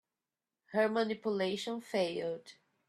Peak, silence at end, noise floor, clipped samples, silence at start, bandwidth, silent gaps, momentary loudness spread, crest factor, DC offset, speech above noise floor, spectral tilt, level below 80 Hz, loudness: -18 dBFS; 0.35 s; under -90 dBFS; under 0.1%; 0.7 s; 13.5 kHz; none; 8 LU; 18 dB; under 0.1%; over 56 dB; -5 dB/octave; -82 dBFS; -35 LUFS